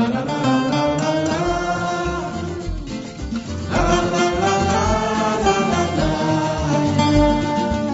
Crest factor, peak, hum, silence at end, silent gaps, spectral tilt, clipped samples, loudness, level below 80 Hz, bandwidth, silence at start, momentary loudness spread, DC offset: 16 dB; -4 dBFS; none; 0 s; none; -5.5 dB/octave; under 0.1%; -19 LUFS; -32 dBFS; 8 kHz; 0 s; 10 LU; under 0.1%